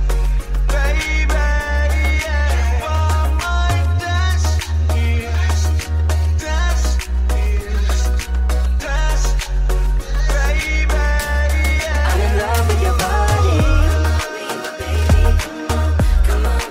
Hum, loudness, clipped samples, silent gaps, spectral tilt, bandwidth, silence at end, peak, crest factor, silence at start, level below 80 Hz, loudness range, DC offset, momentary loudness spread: none; -18 LUFS; under 0.1%; none; -5 dB/octave; 16 kHz; 0 s; -2 dBFS; 12 dB; 0 s; -16 dBFS; 3 LU; under 0.1%; 5 LU